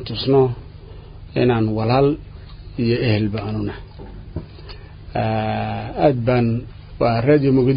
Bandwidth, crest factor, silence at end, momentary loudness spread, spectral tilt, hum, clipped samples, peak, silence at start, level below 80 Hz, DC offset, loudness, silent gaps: 5.2 kHz; 18 dB; 0 s; 22 LU; -12.5 dB/octave; none; under 0.1%; -2 dBFS; 0 s; -38 dBFS; under 0.1%; -19 LUFS; none